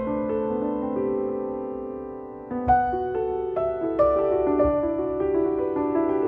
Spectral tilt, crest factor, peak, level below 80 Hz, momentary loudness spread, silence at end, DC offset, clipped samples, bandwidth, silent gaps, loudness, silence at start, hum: -10.5 dB/octave; 16 dB; -10 dBFS; -44 dBFS; 11 LU; 0 s; under 0.1%; under 0.1%; 3.8 kHz; none; -25 LUFS; 0 s; none